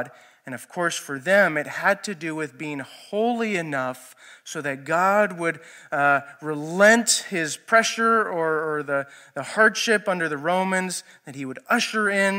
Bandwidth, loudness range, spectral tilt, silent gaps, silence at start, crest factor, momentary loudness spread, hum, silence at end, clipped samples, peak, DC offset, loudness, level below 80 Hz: 16 kHz; 5 LU; -3 dB/octave; none; 0 s; 22 dB; 16 LU; none; 0 s; under 0.1%; -2 dBFS; under 0.1%; -22 LUFS; -84 dBFS